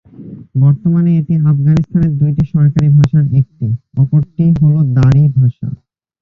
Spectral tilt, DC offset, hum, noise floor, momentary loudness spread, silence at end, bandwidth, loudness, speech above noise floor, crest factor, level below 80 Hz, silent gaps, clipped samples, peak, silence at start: -10.5 dB/octave; under 0.1%; none; -32 dBFS; 8 LU; 0.45 s; 6.4 kHz; -12 LUFS; 22 dB; 10 dB; -36 dBFS; none; under 0.1%; -2 dBFS; 0.2 s